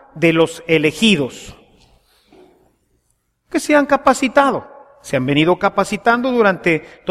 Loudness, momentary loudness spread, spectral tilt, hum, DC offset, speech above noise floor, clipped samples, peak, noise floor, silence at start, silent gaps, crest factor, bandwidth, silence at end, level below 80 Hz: -16 LUFS; 9 LU; -5 dB/octave; none; under 0.1%; 50 dB; under 0.1%; 0 dBFS; -66 dBFS; 0.15 s; none; 16 dB; 15 kHz; 0 s; -50 dBFS